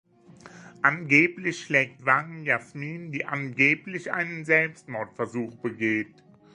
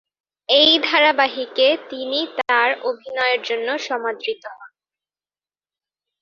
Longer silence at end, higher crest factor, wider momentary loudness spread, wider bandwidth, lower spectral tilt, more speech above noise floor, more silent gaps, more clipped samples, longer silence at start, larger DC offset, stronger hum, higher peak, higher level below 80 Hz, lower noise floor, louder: second, 0.5 s vs 1.55 s; about the same, 22 dB vs 20 dB; about the same, 14 LU vs 13 LU; first, 10.5 kHz vs 7.2 kHz; first, -5.5 dB/octave vs -1.5 dB/octave; second, 24 dB vs over 71 dB; neither; neither; second, 0.3 s vs 0.5 s; neither; second, none vs 50 Hz at -85 dBFS; about the same, -4 dBFS vs -2 dBFS; about the same, -72 dBFS vs -70 dBFS; second, -51 dBFS vs under -90 dBFS; second, -25 LUFS vs -18 LUFS